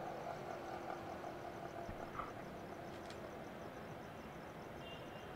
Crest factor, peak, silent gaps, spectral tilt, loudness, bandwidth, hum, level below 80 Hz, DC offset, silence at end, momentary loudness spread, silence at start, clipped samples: 18 dB; -32 dBFS; none; -5.5 dB/octave; -49 LUFS; 16 kHz; none; -66 dBFS; under 0.1%; 0 s; 4 LU; 0 s; under 0.1%